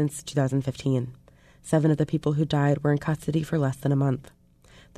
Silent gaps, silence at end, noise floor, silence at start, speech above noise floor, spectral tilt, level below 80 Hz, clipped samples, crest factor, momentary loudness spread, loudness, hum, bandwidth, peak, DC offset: none; 0.75 s; -54 dBFS; 0 s; 30 dB; -7 dB/octave; -54 dBFS; under 0.1%; 18 dB; 5 LU; -25 LUFS; none; 13 kHz; -8 dBFS; under 0.1%